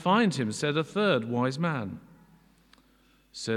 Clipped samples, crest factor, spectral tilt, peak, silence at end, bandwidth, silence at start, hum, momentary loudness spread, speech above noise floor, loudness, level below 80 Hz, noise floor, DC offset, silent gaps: under 0.1%; 18 dB; -5.5 dB/octave; -12 dBFS; 0 s; 12.5 kHz; 0 s; none; 15 LU; 36 dB; -28 LUFS; -68 dBFS; -63 dBFS; under 0.1%; none